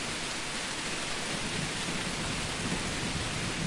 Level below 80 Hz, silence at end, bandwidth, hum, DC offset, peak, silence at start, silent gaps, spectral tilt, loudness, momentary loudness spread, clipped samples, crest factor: -48 dBFS; 0 s; 11.5 kHz; none; under 0.1%; -18 dBFS; 0 s; none; -3 dB/octave; -32 LUFS; 1 LU; under 0.1%; 16 dB